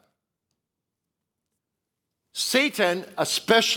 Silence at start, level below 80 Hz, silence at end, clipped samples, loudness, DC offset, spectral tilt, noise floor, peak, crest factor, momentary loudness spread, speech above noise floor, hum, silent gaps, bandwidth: 2.35 s; -74 dBFS; 0 s; under 0.1%; -23 LUFS; under 0.1%; -2 dB/octave; -84 dBFS; -6 dBFS; 22 dB; 8 LU; 62 dB; none; none; 19.5 kHz